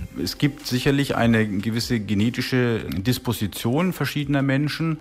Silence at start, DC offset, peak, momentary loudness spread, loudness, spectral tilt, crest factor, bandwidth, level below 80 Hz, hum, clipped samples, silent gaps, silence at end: 0 s; under 0.1%; -6 dBFS; 5 LU; -23 LUFS; -6 dB/octave; 16 dB; 16 kHz; -46 dBFS; none; under 0.1%; none; 0 s